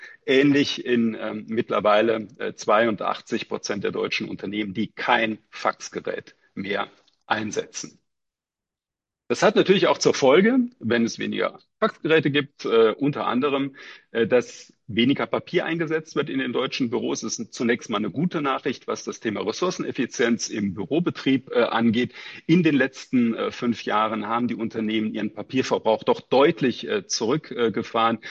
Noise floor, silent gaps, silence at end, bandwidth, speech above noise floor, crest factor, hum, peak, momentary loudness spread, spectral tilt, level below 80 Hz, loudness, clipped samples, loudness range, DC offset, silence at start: -89 dBFS; none; 0 s; 8.2 kHz; 66 dB; 18 dB; none; -4 dBFS; 10 LU; -5 dB/octave; -64 dBFS; -23 LUFS; under 0.1%; 6 LU; under 0.1%; 0 s